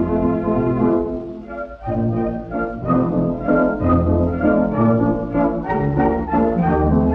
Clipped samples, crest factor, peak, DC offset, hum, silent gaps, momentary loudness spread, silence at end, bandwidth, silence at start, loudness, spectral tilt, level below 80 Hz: under 0.1%; 14 dB; -4 dBFS; under 0.1%; none; none; 8 LU; 0 s; 4.6 kHz; 0 s; -18 LUFS; -11.5 dB/octave; -34 dBFS